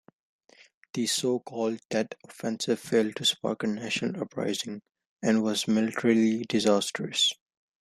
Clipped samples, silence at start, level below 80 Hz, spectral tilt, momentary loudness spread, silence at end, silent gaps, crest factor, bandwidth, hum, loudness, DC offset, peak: under 0.1%; 0.95 s; -72 dBFS; -3.5 dB/octave; 10 LU; 0.5 s; 1.85-1.89 s, 5.06-5.17 s; 18 dB; 14 kHz; none; -28 LUFS; under 0.1%; -10 dBFS